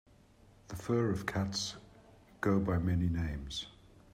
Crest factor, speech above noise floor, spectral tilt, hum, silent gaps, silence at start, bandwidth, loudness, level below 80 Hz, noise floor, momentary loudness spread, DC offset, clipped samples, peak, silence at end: 18 dB; 29 dB; -5.5 dB/octave; none; none; 0.7 s; 15 kHz; -35 LUFS; -52 dBFS; -62 dBFS; 13 LU; under 0.1%; under 0.1%; -18 dBFS; 0.15 s